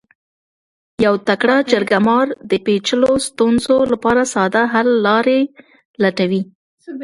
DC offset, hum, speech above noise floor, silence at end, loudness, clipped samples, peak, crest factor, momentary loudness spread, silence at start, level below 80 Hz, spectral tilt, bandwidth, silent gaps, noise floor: under 0.1%; none; over 75 dB; 0 s; -15 LUFS; under 0.1%; 0 dBFS; 16 dB; 5 LU; 1 s; -52 dBFS; -4.5 dB/octave; 11.5 kHz; 5.85-5.94 s, 6.55-6.78 s; under -90 dBFS